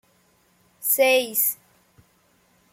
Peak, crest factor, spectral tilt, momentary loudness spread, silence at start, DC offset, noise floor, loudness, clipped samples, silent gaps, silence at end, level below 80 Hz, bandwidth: -8 dBFS; 18 dB; 0 dB/octave; 11 LU; 0.8 s; under 0.1%; -62 dBFS; -20 LUFS; under 0.1%; none; 1.2 s; -74 dBFS; 16.5 kHz